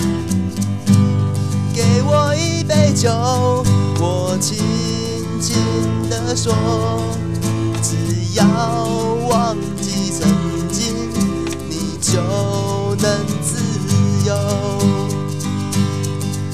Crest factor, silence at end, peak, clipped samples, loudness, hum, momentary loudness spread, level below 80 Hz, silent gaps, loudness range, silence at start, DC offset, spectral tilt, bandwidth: 16 dB; 0 s; 0 dBFS; under 0.1%; -17 LUFS; none; 6 LU; -40 dBFS; none; 3 LU; 0 s; 1%; -5.5 dB/octave; 15 kHz